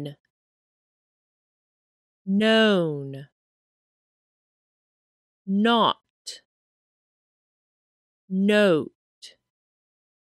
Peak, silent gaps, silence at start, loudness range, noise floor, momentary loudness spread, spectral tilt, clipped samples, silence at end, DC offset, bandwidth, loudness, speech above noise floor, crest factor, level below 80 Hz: -8 dBFS; 0.20-0.24 s, 0.30-2.25 s, 3.32-5.45 s, 6.10-6.25 s, 6.45-8.28 s, 8.95-9.22 s; 0 s; 2 LU; under -90 dBFS; 21 LU; -6 dB/octave; under 0.1%; 1 s; under 0.1%; 12 kHz; -22 LUFS; over 69 dB; 20 dB; -80 dBFS